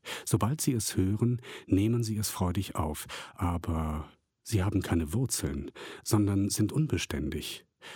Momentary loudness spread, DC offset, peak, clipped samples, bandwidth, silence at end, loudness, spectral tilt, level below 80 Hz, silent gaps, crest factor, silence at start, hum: 11 LU; under 0.1%; -12 dBFS; under 0.1%; 17.5 kHz; 0 s; -31 LUFS; -5.5 dB/octave; -46 dBFS; none; 18 dB; 0.05 s; none